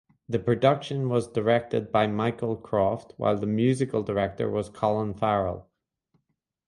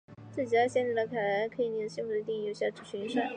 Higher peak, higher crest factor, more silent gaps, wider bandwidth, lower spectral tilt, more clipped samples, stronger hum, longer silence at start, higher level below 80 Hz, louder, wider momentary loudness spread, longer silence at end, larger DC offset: first, -8 dBFS vs -16 dBFS; about the same, 20 dB vs 16 dB; neither; first, 11.5 kHz vs 9.8 kHz; first, -7.5 dB/octave vs -5 dB/octave; neither; neither; first, 0.3 s vs 0.1 s; first, -54 dBFS vs -74 dBFS; first, -26 LUFS vs -32 LUFS; about the same, 6 LU vs 8 LU; first, 1.05 s vs 0 s; neither